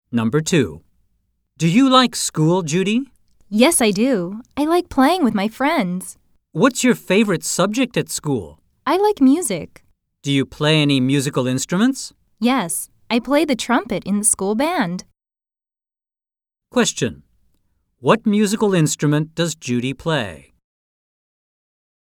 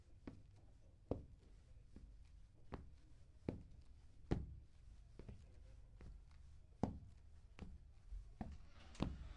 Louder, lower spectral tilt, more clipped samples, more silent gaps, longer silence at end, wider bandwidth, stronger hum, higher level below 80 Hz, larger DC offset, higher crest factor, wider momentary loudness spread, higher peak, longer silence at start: first, -18 LUFS vs -54 LUFS; second, -4.5 dB/octave vs -8 dB/octave; neither; neither; first, 1.65 s vs 0 s; first, 18.5 kHz vs 10.5 kHz; neither; about the same, -54 dBFS vs -58 dBFS; neither; second, 18 dB vs 30 dB; second, 10 LU vs 19 LU; first, 0 dBFS vs -22 dBFS; about the same, 0.1 s vs 0 s